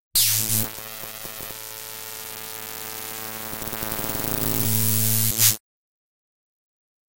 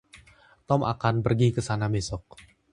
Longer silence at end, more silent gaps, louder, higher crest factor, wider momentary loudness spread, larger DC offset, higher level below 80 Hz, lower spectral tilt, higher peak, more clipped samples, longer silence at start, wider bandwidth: first, 1.35 s vs 0.5 s; first, 0.00-0.11 s vs none; first, -23 LUFS vs -26 LUFS; about the same, 24 dB vs 20 dB; first, 15 LU vs 8 LU; neither; about the same, -50 dBFS vs -48 dBFS; second, -2 dB/octave vs -6.5 dB/octave; first, -2 dBFS vs -8 dBFS; neither; second, 0 s vs 0.15 s; first, 18 kHz vs 11 kHz